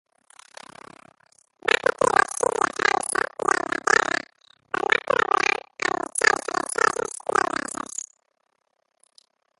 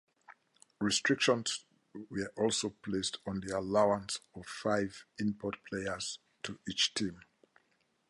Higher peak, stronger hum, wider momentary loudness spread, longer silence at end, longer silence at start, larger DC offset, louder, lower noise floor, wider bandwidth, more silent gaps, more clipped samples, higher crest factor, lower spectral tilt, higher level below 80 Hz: first, -2 dBFS vs -14 dBFS; neither; about the same, 12 LU vs 13 LU; first, 1.6 s vs 0.9 s; first, 1.65 s vs 0.3 s; neither; first, -23 LUFS vs -34 LUFS; about the same, -73 dBFS vs -75 dBFS; about the same, 12 kHz vs 11.5 kHz; neither; neither; about the same, 24 dB vs 22 dB; second, -1.5 dB/octave vs -3.5 dB/octave; about the same, -64 dBFS vs -66 dBFS